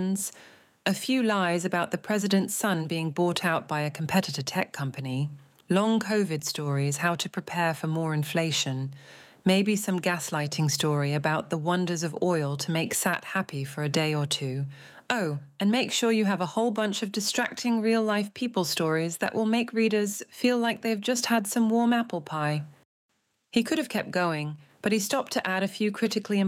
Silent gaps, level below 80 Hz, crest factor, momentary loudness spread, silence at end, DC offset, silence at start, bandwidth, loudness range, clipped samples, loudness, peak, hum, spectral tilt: 22.85-23.09 s; -74 dBFS; 20 dB; 7 LU; 0 s; under 0.1%; 0 s; 17 kHz; 2 LU; under 0.1%; -27 LUFS; -6 dBFS; none; -4.5 dB/octave